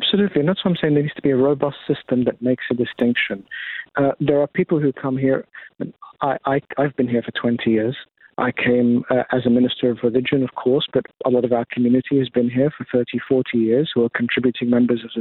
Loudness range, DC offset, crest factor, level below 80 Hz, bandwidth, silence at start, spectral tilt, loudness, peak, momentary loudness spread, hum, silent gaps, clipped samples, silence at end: 3 LU; under 0.1%; 14 dB; -60 dBFS; 4.2 kHz; 0 s; -10 dB/octave; -20 LUFS; -4 dBFS; 7 LU; none; none; under 0.1%; 0 s